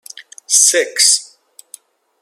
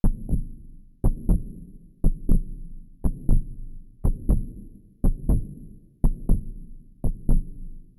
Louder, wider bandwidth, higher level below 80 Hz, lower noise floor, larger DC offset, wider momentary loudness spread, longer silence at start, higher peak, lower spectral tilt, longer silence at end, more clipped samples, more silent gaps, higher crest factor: first, -11 LUFS vs -29 LUFS; first, over 20 kHz vs 12 kHz; second, -82 dBFS vs -24 dBFS; about the same, -45 dBFS vs -44 dBFS; neither; second, 5 LU vs 20 LU; first, 0.5 s vs 0.05 s; first, 0 dBFS vs -8 dBFS; second, 3.5 dB/octave vs -11 dB/octave; first, 1 s vs 0.15 s; neither; neither; about the same, 18 dB vs 16 dB